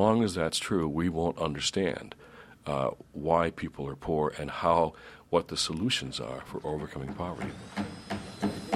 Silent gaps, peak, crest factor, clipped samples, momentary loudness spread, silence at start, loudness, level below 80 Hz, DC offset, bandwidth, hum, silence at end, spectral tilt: none; -10 dBFS; 22 dB; under 0.1%; 11 LU; 0 s; -31 LUFS; -52 dBFS; under 0.1%; 14.5 kHz; none; 0 s; -5 dB/octave